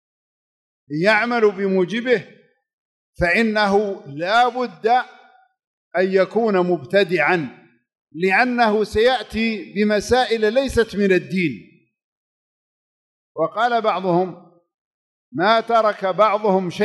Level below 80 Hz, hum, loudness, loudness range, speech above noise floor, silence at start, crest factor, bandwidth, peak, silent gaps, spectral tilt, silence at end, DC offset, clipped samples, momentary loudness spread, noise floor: -48 dBFS; none; -19 LUFS; 5 LU; over 72 dB; 0.9 s; 16 dB; 12 kHz; -4 dBFS; 2.73-3.13 s, 5.67-5.91 s, 8.01-8.07 s, 12.04-13.35 s, 14.74-15.32 s; -5.5 dB/octave; 0 s; under 0.1%; under 0.1%; 8 LU; under -90 dBFS